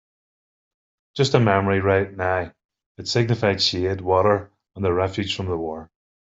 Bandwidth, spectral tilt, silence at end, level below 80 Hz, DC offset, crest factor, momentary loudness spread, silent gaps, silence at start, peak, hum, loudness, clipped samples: 8 kHz; -5.5 dB/octave; 0.45 s; -58 dBFS; under 0.1%; 20 dB; 11 LU; 2.65-2.69 s, 2.86-2.95 s; 1.15 s; -2 dBFS; none; -21 LUFS; under 0.1%